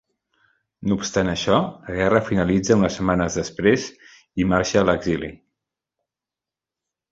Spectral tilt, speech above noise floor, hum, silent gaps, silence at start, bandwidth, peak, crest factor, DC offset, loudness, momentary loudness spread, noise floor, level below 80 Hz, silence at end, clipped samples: -5.5 dB/octave; 68 dB; none; none; 0.8 s; 7.8 kHz; -2 dBFS; 20 dB; under 0.1%; -21 LUFS; 9 LU; -89 dBFS; -44 dBFS; 1.75 s; under 0.1%